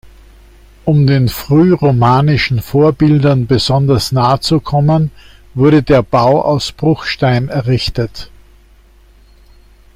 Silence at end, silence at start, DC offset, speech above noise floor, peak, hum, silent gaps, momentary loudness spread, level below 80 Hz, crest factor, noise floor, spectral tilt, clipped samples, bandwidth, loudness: 1.7 s; 0.05 s; under 0.1%; 33 dB; 0 dBFS; none; none; 5 LU; -36 dBFS; 12 dB; -44 dBFS; -7 dB/octave; under 0.1%; 16 kHz; -12 LUFS